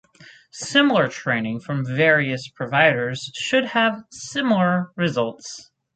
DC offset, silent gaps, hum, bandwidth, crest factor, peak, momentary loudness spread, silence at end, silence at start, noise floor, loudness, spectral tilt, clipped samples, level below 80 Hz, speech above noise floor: under 0.1%; none; none; 9.2 kHz; 18 dB; -4 dBFS; 15 LU; 0.35 s; 0.2 s; -49 dBFS; -20 LUFS; -5 dB/octave; under 0.1%; -64 dBFS; 28 dB